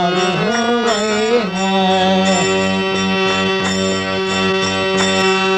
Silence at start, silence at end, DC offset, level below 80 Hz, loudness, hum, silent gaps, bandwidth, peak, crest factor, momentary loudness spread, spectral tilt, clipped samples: 0 s; 0 s; under 0.1%; -50 dBFS; -15 LUFS; none; none; 10.5 kHz; -4 dBFS; 12 dB; 3 LU; -4 dB/octave; under 0.1%